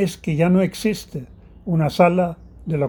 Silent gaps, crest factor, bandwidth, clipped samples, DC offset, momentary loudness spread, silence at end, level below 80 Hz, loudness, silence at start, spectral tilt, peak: none; 18 dB; over 20 kHz; under 0.1%; under 0.1%; 18 LU; 0 s; -46 dBFS; -20 LUFS; 0 s; -7 dB/octave; -2 dBFS